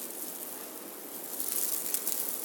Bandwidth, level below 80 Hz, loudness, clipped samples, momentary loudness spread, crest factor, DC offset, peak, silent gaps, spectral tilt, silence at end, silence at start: 19 kHz; under -90 dBFS; -32 LUFS; under 0.1%; 11 LU; 28 dB; under 0.1%; -8 dBFS; none; 0 dB/octave; 0 s; 0 s